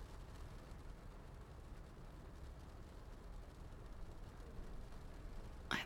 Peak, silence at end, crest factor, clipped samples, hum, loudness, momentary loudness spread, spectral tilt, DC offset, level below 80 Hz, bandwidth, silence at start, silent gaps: -22 dBFS; 0 s; 28 dB; under 0.1%; none; -56 LUFS; 2 LU; -4.5 dB/octave; under 0.1%; -54 dBFS; 17 kHz; 0 s; none